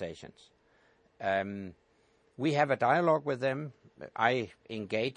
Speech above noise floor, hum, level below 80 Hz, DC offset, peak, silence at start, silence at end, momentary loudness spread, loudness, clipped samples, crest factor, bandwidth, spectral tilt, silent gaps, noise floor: 37 dB; none; -74 dBFS; under 0.1%; -10 dBFS; 0 s; 0.05 s; 20 LU; -31 LUFS; under 0.1%; 22 dB; 10 kHz; -6.5 dB/octave; none; -68 dBFS